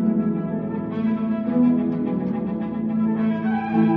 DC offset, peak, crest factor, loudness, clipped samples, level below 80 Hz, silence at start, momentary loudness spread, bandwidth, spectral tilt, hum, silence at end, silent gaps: under 0.1%; -8 dBFS; 14 dB; -23 LUFS; under 0.1%; -54 dBFS; 0 s; 7 LU; 4.2 kHz; -8.5 dB/octave; none; 0 s; none